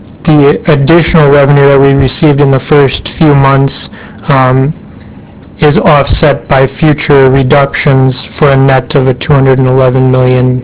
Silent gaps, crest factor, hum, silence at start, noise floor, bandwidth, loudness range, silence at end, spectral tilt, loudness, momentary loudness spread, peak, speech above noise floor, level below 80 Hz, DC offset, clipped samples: none; 6 dB; none; 0 s; -29 dBFS; 4 kHz; 3 LU; 0 s; -11.5 dB/octave; -7 LUFS; 6 LU; 0 dBFS; 23 dB; -26 dBFS; 0.3%; 6%